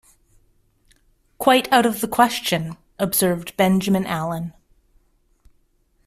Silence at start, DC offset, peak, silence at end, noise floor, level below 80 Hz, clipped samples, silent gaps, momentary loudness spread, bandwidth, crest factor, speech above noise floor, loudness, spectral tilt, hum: 1.4 s; under 0.1%; -2 dBFS; 1.55 s; -63 dBFS; -54 dBFS; under 0.1%; none; 10 LU; 16 kHz; 20 dB; 43 dB; -20 LUFS; -4.5 dB/octave; none